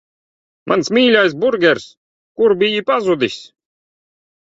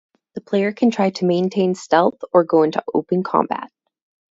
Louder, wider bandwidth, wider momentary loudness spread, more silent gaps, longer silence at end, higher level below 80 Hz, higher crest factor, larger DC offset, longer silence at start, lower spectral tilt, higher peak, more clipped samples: first, -15 LUFS vs -19 LUFS; about the same, 7.8 kHz vs 8 kHz; about the same, 9 LU vs 10 LU; first, 1.97-2.35 s vs none; first, 0.95 s vs 0.65 s; first, -60 dBFS vs -66 dBFS; about the same, 16 dB vs 18 dB; neither; first, 0.65 s vs 0.35 s; second, -4.5 dB/octave vs -6.5 dB/octave; about the same, 0 dBFS vs 0 dBFS; neither